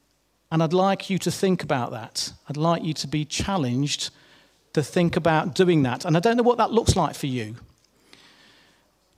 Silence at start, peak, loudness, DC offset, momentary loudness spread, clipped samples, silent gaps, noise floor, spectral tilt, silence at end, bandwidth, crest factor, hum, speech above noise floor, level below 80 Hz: 0.5 s; -4 dBFS; -23 LUFS; under 0.1%; 9 LU; under 0.1%; none; -67 dBFS; -5.5 dB/octave; 1.6 s; 15.5 kHz; 20 dB; none; 44 dB; -46 dBFS